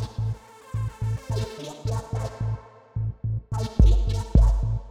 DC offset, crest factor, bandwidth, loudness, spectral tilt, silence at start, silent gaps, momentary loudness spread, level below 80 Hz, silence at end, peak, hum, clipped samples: under 0.1%; 18 dB; 9.8 kHz; -27 LUFS; -7.5 dB/octave; 0 s; none; 13 LU; -26 dBFS; 0 s; -6 dBFS; none; under 0.1%